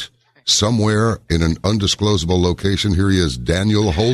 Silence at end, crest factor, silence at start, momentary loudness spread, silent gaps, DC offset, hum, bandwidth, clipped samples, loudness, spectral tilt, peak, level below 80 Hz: 0 s; 14 dB; 0 s; 3 LU; none; under 0.1%; none; 13 kHz; under 0.1%; -17 LUFS; -5 dB/octave; -2 dBFS; -32 dBFS